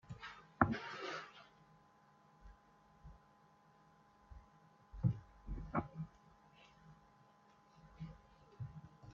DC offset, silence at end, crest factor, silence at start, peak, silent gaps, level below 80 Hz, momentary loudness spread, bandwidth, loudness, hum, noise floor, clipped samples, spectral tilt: under 0.1%; 0 s; 34 dB; 0.05 s; -12 dBFS; none; -60 dBFS; 28 LU; 7.4 kHz; -44 LUFS; none; -69 dBFS; under 0.1%; -5.5 dB/octave